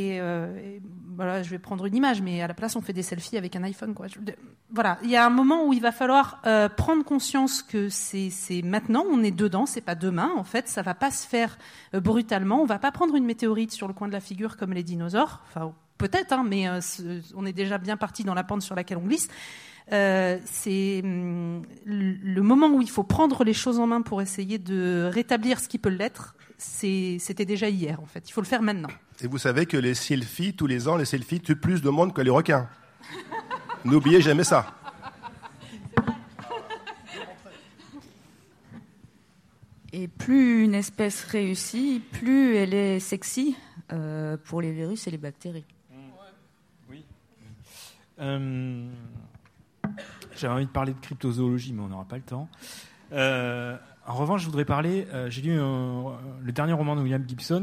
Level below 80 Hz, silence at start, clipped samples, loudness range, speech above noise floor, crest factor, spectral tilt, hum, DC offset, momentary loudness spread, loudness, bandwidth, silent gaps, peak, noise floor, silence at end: -56 dBFS; 0 s; under 0.1%; 12 LU; 35 dB; 20 dB; -5.5 dB/octave; none; under 0.1%; 17 LU; -26 LUFS; 15.5 kHz; none; -6 dBFS; -60 dBFS; 0 s